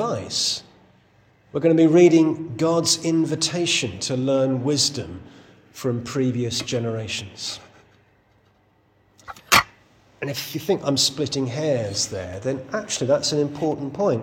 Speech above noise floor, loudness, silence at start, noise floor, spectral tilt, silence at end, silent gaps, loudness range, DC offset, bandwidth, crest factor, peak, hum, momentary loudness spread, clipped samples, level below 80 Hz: 39 dB; -21 LUFS; 0 s; -60 dBFS; -4 dB/octave; 0 s; none; 9 LU; under 0.1%; 17 kHz; 22 dB; 0 dBFS; none; 13 LU; under 0.1%; -58 dBFS